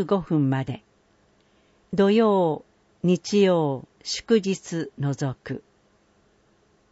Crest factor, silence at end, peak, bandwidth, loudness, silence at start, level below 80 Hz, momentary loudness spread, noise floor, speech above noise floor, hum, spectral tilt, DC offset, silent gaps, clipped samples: 18 dB; 1.3 s; -8 dBFS; 8 kHz; -24 LUFS; 0 s; -60 dBFS; 15 LU; -62 dBFS; 40 dB; none; -6.5 dB/octave; under 0.1%; none; under 0.1%